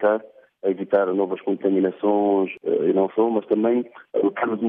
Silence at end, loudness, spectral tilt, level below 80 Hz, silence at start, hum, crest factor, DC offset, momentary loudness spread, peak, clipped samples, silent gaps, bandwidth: 0 s; -22 LUFS; -10.5 dB/octave; -76 dBFS; 0 s; none; 14 dB; under 0.1%; 6 LU; -6 dBFS; under 0.1%; none; 3.7 kHz